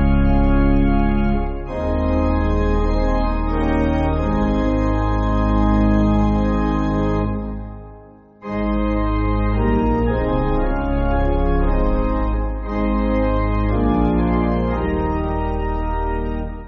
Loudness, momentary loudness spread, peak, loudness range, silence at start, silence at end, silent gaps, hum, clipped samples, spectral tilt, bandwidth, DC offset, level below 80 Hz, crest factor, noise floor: -20 LUFS; 7 LU; -4 dBFS; 3 LU; 0 s; 0 s; none; none; under 0.1%; -7.5 dB/octave; 6.6 kHz; under 0.1%; -22 dBFS; 14 dB; -43 dBFS